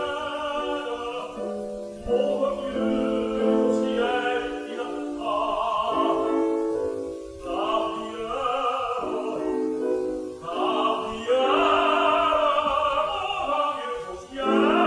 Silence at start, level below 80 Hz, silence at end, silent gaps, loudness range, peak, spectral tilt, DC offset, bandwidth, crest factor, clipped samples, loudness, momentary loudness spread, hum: 0 s; -52 dBFS; 0 s; none; 5 LU; -8 dBFS; -5 dB/octave; under 0.1%; 11 kHz; 16 dB; under 0.1%; -25 LUFS; 11 LU; none